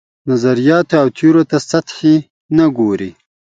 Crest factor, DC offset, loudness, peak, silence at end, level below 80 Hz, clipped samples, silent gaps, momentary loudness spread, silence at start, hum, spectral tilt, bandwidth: 14 dB; under 0.1%; -13 LUFS; 0 dBFS; 0.5 s; -54 dBFS; under 0.1%; 2.30-2.49 s; 7 LU; 0.25 s; none; -6.5 dB/octave; 7.8 kHz